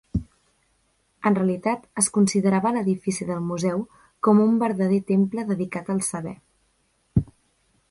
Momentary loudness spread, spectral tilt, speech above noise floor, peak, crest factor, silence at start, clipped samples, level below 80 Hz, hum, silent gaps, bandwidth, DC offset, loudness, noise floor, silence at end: 11 LU; -6 dB/octave; 45 dB; -6 dBFS; 18 dB; 0.15 s; under 0.1%; -48 dBFS; none; none; 11.5 kHz; under 0.1%; -23 LUFS; -67 dBFS; 0.65 s